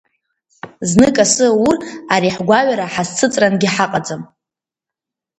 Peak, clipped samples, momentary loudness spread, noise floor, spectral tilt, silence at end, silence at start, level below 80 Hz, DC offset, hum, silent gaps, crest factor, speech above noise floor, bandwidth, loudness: 0 dBFS; under 0.1%; 9 LU; -86 dBFS; -4 dB/octave; 1.15 s; 0.65 s; -48 dBFS; under 0.1%; none; none; 16 dB; 72 dB; 11.5 kHz; -14 LUFS